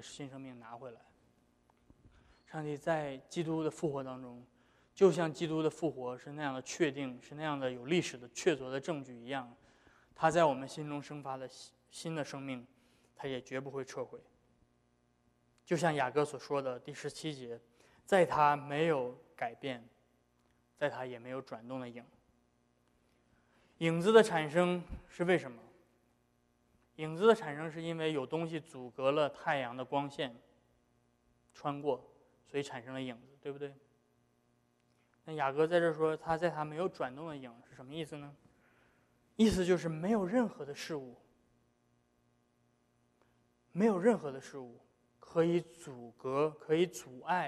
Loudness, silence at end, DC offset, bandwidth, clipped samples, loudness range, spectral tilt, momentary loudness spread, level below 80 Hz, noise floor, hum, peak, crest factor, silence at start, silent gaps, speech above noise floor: -35 LUFS; 0 s; under 0.1%; 13 kHz; under 0.1%; 10 LU; -5.5 dB/octave; 18 LU; -66 dBFS; -74 dBFS; none; -10 dBFS; 26 dB; 0 s; none; 40 dB